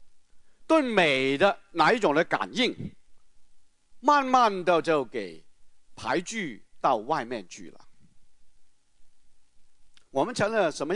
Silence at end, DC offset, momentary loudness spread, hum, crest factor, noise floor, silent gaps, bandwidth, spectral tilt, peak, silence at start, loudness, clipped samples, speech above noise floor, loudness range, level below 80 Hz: 0 s; under 0.1%; 16 LU; none; 22 dB; -51 dBFS; none; 11 kHz; -4.5 dB/octave; -6 dBFS; 0 s; -25 LUFS; under 0.1%; 26 dB; 9 LU; -64 dBFS